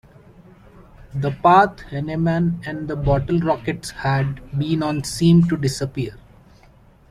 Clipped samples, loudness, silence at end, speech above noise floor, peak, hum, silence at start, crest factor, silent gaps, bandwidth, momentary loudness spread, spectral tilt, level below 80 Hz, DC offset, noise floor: under 0.1%; -20 LUFS; 0.95 s; 31 dB; -2 dBFS; none; 1 s; 18 dB; none; 13.5 kHz; 13 LU; -6.5 dB/octave; -40 dBFS; under 0.1%; -50 dBFS